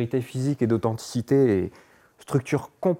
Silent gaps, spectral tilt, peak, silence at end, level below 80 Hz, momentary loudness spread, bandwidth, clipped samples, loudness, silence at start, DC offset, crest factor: none; -7.5 dB/octave; -10 dBFS; 0 s; -62 dBFS; 8 LU; 16.5 kHz; under 0.1%; -25 LUFS; 0 s; under 0.1%; 14 dB